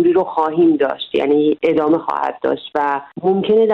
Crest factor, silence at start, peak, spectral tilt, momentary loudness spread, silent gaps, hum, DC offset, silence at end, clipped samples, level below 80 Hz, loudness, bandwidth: 12 dB; 0 s; -4 dBFS; -8 dB/octave; 6 LU; none; none; under 0.1%; 0 s; under 0.1%; -58 dBFS; -17 LUFS; 5.4 kHz